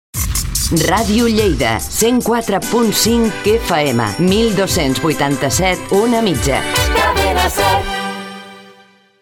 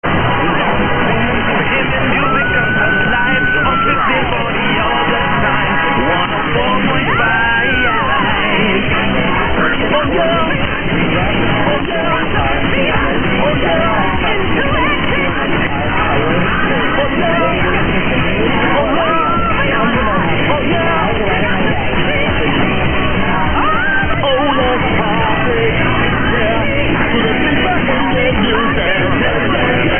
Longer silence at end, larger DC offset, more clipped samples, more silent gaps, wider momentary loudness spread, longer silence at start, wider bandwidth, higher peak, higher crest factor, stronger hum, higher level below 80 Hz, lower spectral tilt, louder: first, 0.5 s vs 0 s; neither; neither; neither; about the same, 4 LU vs 2 LU; about the same, 0.15 s vs 0.05 s; first, 18 kHz vs 3.5 kHz; about the same, 0 dBFS vs 0 dBFS; about the same, 14 dB vs 12 dB; neither; about the same, -28 dBFS vs -26 dBFS; second, -4 dB/octave vs -10 dB/octave; about the same, -14 LUFS vs -13 LUFS